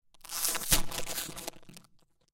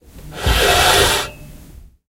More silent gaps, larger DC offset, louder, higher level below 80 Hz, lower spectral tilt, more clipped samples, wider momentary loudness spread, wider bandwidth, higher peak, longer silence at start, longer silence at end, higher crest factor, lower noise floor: neither; neither; second, -31 LUFS vs -14 LUFS; second, -42 dBFS vs -26 dBFS; second, -1 dB/octave vs -2.5 dB/octave; neither; about the same, 14 LU vs 16 LU; about the same, 17 kHz vs 16 kHz; second, -6 dBFS vs 0 dBFS; about the same, 0.15 s vs 0.15 s; about the same, 0.55 s vs 0.55 s; first, 28 dB vs 18 dB; first, -64 dBFS vs -41 dBFS